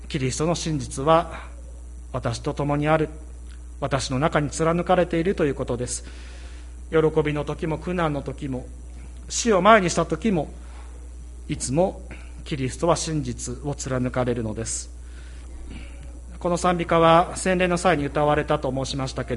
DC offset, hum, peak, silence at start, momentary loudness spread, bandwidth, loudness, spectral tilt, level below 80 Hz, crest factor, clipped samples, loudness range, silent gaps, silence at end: under 0.1%; none; -2 dBFS; 0 s; 21 LU; 11.5 kHz; -23 LUFS; -5 dB/octave; -38 dBFS; 22 dB; under 0.1%; 5 LU; none; 0 s